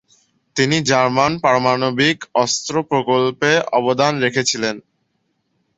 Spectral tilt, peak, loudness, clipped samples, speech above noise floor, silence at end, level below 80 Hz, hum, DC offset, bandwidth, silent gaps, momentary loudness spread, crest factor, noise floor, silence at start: -4 dB/octave; 0 dBFS; -17 LUFS; under 0.1%; 51 dB; 0.95 s; -56 dBFS; none; under 0.1%; 8.2 kHz; none; 5 LU; 18 dB; -68 dBFS; 0.55 s